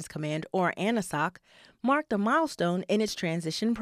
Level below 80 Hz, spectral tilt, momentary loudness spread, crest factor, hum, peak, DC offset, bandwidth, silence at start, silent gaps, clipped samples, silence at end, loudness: -64 dBFS; -5 dB/octave; 6 LU; 16 dB; none; -14 dBFS; under 0.1%; 15 kHz; 0 s; none; under 0.1%; 0 s; -29 LUFS